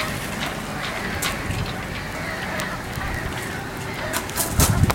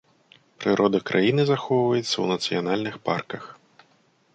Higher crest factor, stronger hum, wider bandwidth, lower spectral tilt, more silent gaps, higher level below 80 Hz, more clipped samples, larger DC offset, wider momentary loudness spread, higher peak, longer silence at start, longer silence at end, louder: first, 24 dB vs 18 dB; neither; first, 17 kHz vs 9 kHz; second, -4 dB/octave vs -5.5 dB/octave; neither; first, -36 dBFS vs -66 dBFS; neither; neither; about the same, 8 LU vs 9 LU; first, 0 dBFS vs -6 dBFS; second, 0 s vs 0.6 s; second, 0 s vs 0.8 s; about the same, -25 LUFS vs -23 LUFS